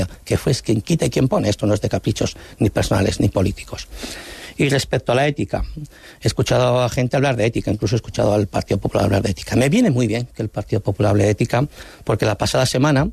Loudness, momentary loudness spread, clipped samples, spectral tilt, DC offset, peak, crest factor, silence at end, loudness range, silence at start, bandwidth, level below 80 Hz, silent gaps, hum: -19 LUFS; 10 LU; under 0.1%; -6 dB/octave; under 0.1%; -6 dBFS; 14 dB; 0 s; 2 LU; 0 s; 14 kHz; -38 dBFS; none; none